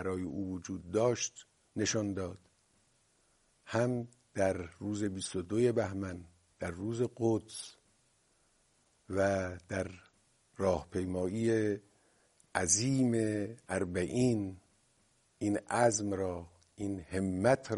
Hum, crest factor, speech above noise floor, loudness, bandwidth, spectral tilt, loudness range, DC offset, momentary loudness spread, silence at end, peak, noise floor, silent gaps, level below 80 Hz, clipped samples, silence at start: none; 22 dB; 39 dB; -34 LUFS; 11.5 kHz; -5 dB/octave; 5 LU; under 0.1%; 13 LU; 0 s; -14 dBFS; -72 dBFS; none; -64 dBFS; under 0.1%; 0 s